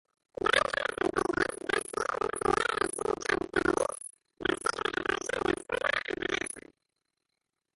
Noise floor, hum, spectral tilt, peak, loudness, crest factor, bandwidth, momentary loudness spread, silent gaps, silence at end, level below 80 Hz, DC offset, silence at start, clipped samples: -85 dBFS; none; -3 dB/octave; -10 dBFS; -31 LUFS; 22 dB; 12 kHz; 7 LU; none; 1.15 s; -58 dBFS; under 0.1%; 0.45 s; under 0.1%